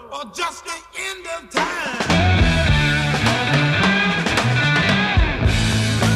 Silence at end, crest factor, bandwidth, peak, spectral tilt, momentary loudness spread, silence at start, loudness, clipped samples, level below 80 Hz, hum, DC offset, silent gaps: 0 s; 14 dB; 14 kHz; -4 dBFS; -4.5 dB/octave; 11 LU; 0 s; -18 LUFS; under 0.1%; -28 dBFS; none; under 0.1%; none